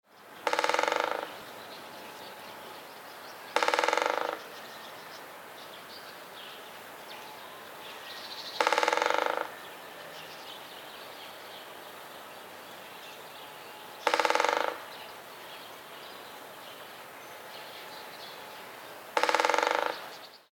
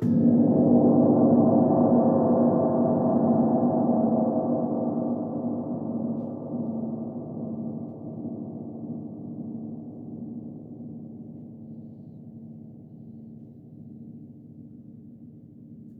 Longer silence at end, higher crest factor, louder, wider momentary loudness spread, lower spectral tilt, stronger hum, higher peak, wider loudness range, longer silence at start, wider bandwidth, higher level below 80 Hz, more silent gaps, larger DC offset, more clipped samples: about the same, 0.1 s vs 0 s; first, 28 dB vs 16 dB; second, -32 LUFS vs -24 LUFS; second, 18 LU vs 25 LU; second, -1 dB/octave vs -14 dB/octave; neither; first, -6 dBFS vs -10 dBFS; second, 12 LU vs 24 LU; about the same, 0.1 s vs 0 s; first, 19 kHz vs 1.8 kHz; second, -86 dBFS vs -64 dBFS; neither; neither; neither